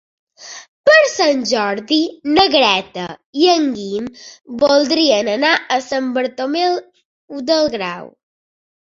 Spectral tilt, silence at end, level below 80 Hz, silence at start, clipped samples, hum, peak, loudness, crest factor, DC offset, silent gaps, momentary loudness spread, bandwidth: -3 dB/octave; 0.9 s; -56 dBFS; 0.4 s; under 0.1%; none; 0 dBFS; -15 LUFS; 16 dB; under 0.1%; 0.68-0.84 s, 3.26-3.33 s, 7.05-7.28 s; 17 LU; 7.8 kHz